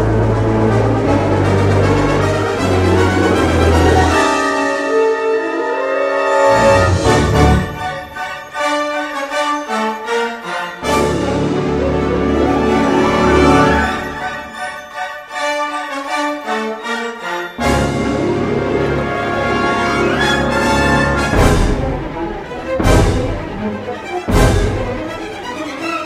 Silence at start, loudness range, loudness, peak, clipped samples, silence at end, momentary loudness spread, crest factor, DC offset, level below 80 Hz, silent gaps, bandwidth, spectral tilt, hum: 0 s; 5 LU; -15 LUFS; 0 dBFS; under 0.1%; 0 s; 11 LU; 14 dB; under 0.1%; -26 dBFS; none; 15.5 kHz; -6 dB/octave; none